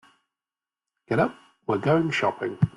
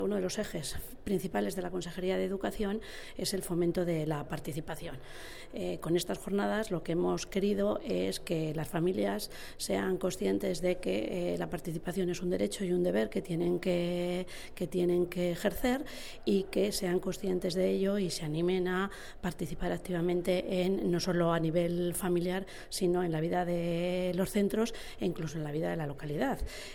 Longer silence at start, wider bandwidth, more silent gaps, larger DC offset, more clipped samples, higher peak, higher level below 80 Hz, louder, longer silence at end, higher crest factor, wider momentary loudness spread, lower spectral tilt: first, 1.1 s vs 0 s; second, 11.5 kHz vs 19 kHz; neither; neither; neither; first, -8 dBFS vs -16 dBFS; second, -58 dBFS vs -50 dBFS; first, -25 LUFS vs -33 LUFS; about the same, 0.05 s vs 0 s; about the same, 18 dB vs 16 dB; about the same, 7 LU vs 8 LU; first, -7 dB/octave vs -5.5 dB/octave